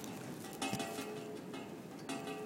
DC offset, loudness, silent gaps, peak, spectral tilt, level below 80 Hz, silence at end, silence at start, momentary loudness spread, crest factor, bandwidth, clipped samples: under 0.1%; -44 LUFS; none; -22 dBFS; -4 dB/octave; -76 dBFS; 0 s; 0 s; 8 LU; 22 dB; 17 kHz; under 0.1%